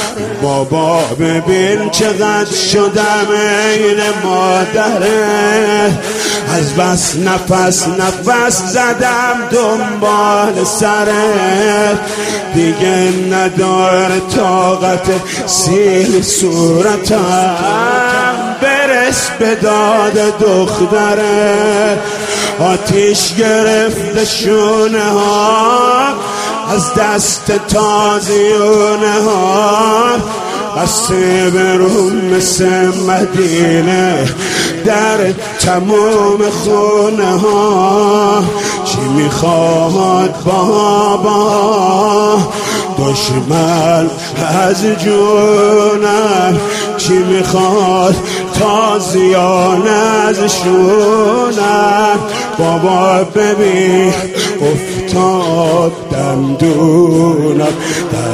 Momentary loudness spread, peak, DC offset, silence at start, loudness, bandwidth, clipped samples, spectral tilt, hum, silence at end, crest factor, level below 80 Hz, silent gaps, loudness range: 5 LU; 0 dBFS; under 0.1%; 0 s; -11 LUFS; 15.5 kHz; under 0.1%; -4 dB/octave; none; 0 s; 10 dB; -42 dBFS; none; 1 LU